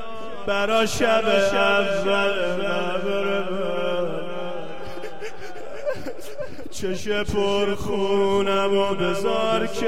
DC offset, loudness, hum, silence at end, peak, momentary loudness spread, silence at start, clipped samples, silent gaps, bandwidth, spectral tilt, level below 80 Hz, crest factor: 4%; -23 LUFS; none; 0 s; -8 dBFS; 16 LU; 0 s; under 0.1%; none; 15.5 kHz; -4.5 dB/octave; -48 dBFS; 16 dB